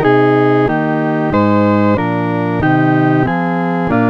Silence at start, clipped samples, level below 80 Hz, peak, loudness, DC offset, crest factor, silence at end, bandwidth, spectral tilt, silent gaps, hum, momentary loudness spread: 0 s; under 0.1%; -40 dBFS; 0 dBFS; -13 LUFS; under 0.1%; 12 dB; 0 s; 6 kHz; -9.5 dB/octave; none; none; 5 LU